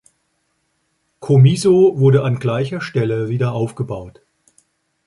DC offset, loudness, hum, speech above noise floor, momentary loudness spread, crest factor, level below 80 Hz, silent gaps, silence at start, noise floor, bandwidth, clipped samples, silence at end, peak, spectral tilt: under 0.1%; -16 LUFS; none; 52 dB; 14 LU; 16 dB; -52 dBFS; none; 1.2 s; -67 dBFS; 11.5 kHz; under 0.1%; 0.95 s; -2 dBFS; -7.5 dB/octave